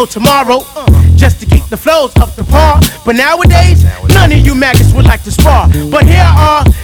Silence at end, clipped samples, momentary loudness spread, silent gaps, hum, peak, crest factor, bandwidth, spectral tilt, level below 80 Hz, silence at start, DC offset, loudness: 0 s; 6%; 5 LU; none; none; 0 dBFS; 6 dB; 18.5 kHz; -5.5 dB/octave; -12 dBFS; 0 s; under 0.1%; -7 LUFS